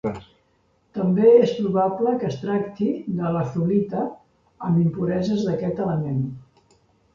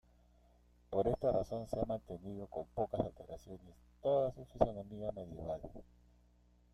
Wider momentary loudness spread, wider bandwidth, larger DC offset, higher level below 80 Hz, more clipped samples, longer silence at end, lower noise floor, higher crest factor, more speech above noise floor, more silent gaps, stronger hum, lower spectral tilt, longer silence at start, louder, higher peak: second, 14 LU vs 17 LU; second, 7.2 kHz vs 13.5 kHz; neither; about the same, -56 dBFS vs -56 dBFS; neither; second, 0.75 s vs 0.9 s; second, -64 dBFS vs -68 dBFS; second, 18 dB vs 26 dB; first, 43 dB vs 29 dB; neither; second, none vs 60 Hz at -60 dBFS; about the same, -9 dB/octave vs -8.5 dB/octave; second, 0.05 s vs 0.9 s; first, -22 LUFS vs -39 LUFS; first, -4 dBFS vs -14 dBFS